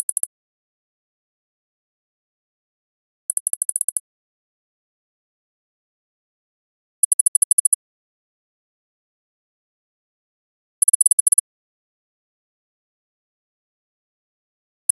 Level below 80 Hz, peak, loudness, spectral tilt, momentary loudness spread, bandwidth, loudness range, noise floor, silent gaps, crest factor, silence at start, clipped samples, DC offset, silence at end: under -90 dBFS; -4 dBFS; -17 LUFS; 9.5 dB/octave; 11 LU; 14 kHz; 10 LU; under -90 dBFS; 0.26-3.46 s, 3.57-3.69 s, 3.84-10.82 s, 10.95-11.00 s, 11.13-11.26 s; 22 dB; 0.25 s; under 0.1%; under 0.1%; 3.65 s